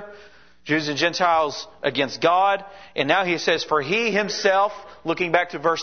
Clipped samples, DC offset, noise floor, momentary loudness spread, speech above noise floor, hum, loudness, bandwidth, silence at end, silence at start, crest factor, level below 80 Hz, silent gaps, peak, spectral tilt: under 0.1%; 0.2%; -50 dBFS; 8 LU; 28 dB; none; -21 LUFS; 6.6 kHz; 0 s; 0 s; 20 dB; -62 dBFS; none; -2 dBFS; -3.5 dB/octave